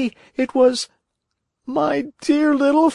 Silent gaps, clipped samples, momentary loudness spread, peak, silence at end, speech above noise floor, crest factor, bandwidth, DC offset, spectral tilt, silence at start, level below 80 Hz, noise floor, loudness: none; under 0.1%; 11 LU; -6 dBFS; 0 s; 59 dB; 14 dB; 11 kHz; under 0.1%; -4 dB/octave; 0 s; -64 dBFS; -77 dBFS; -19 LUFS